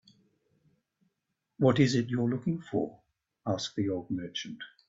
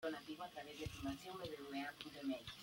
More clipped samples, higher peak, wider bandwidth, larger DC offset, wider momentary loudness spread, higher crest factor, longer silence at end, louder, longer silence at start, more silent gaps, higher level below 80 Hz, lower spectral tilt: neither; first, -12 dBFS vs -32 dBFS; second, 7.8 kHz vs 16.5 kHz; neither; first, 13 LU vs 4 LU; about the same, 20 dB vs 16 dB; first, 0.2 s vs 0 s; first, -31 LUFS vs -49 LUFS; first, 1.6 s vs 0 s; neither; about the same, -68 dBFS vs -68 dBFS; first, -6 dB/octave vs -4.5 dB/octave